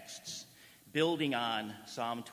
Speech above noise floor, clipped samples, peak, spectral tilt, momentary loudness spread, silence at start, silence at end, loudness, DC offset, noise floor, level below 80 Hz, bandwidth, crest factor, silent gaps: 24 dB; under 0.1%; -18 dBFS; -4 dB/octave; 13 LU; 0 s; 0 s; -36 LUFS; under 0.1%; -59 dBFS; -80 dBFS; 16 kHz; 20 dB; none